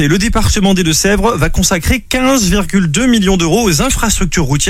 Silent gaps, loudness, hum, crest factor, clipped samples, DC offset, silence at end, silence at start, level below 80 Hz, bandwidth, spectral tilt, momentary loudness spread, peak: none; -11 LUFS; none; 10 dB; under 0.1%; under 0.1%; 0 s; 0 s; -20 dBFS; 16.5 kHz; -4 dB/octave; 3 LU; 0 dBFS